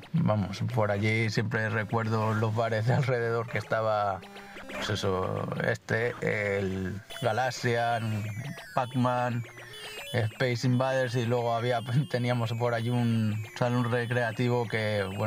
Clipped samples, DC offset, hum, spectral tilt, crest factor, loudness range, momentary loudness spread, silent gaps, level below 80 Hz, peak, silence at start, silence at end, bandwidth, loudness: under 0.1%; under 0.1%; none; -6.5 dB/octave; 18 dB; 2 LU; 7 LU; none; -64 dBFS; -10 dBFS; 0 s; 0 s; 16 kHz; -29 LUFS